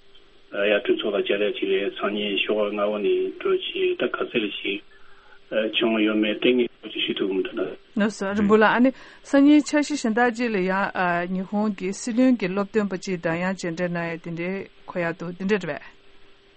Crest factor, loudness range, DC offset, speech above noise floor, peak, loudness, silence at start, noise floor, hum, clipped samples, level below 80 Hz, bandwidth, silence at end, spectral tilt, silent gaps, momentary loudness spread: 18 dB; 5 LU; under 0.1%; 26 dB; -4 dBFS; -23 LUFS; 0.15 s; -49 dBFS; none; under 0.1%; -58 dBFS; 8.4 kHz; 0.25 s; -5 dB/octave; none; 10 LU